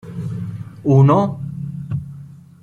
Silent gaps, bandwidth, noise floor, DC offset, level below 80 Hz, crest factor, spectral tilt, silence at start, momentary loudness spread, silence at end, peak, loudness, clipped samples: none; 6.8 kHz; -38 dBFS; under 0.1%; -50 dBFS; 16 dB; -10 dB/octave; 0.05 s; 18 LU; 0.25 s; -2 dBFS; -18 LUFS; under 0.1%